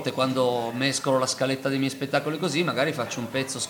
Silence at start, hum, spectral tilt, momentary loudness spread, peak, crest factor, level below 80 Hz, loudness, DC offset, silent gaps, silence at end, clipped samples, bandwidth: 0 s; none; -4 dB/octave; 5 LU; -8 dBFS; 18 dB; -68 dBFS; -25 LUFS; under 0.1%; none; 0 s; under 0.1%; 19.5 kHz